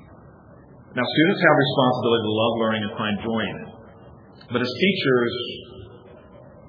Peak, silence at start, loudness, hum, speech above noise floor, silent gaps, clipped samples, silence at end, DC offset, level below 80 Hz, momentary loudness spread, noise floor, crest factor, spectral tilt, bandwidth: -2 dBFS; 0 s; -21 LUFS; none; 26 dB; none; under 0.1%; 0.1 s; under 0.1%; -58 dBFS; 17 LU; -47 dBFS; 22 dB; -7.5 dB/octave; 5.2 kHz